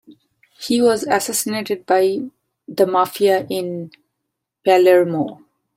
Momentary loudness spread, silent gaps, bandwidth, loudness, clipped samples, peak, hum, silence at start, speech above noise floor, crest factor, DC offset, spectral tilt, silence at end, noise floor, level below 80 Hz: 16 LU; none; 16.5 kHz; -18 LUFS; under 0.1%; -2 dBFS; none; 0.6 s; 61 dB; 16 dB; under 0.1%; -4 dB/octave; 0.45 s; -78 dBFS; -66 dBFS